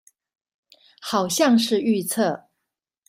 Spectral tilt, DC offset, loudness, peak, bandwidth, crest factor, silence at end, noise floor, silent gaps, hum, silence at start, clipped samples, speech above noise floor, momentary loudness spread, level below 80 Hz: -4 dB/octave; under 0.1%; -21 LUFS; -6 dBFS; 16 kHz; 16 dB; 0.7 s; -82 dBFS; none; none; 1 s; under 0.1%; 62 dB; 12 LU; -70 dBFS